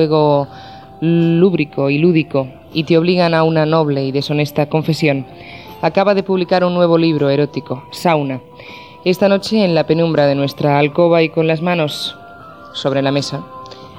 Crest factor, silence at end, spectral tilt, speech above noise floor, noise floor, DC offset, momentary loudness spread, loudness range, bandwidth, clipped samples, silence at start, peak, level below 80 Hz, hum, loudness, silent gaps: 14 dB; 0 s; -7 dB/octave; 22 dB; -36 dBFS; 0.2%; 14 LU; 2 LU; 15.5 kHz; under 0.1%; 0 s; 0 dBFS; -54 dBFS; none; -15 LUFS; none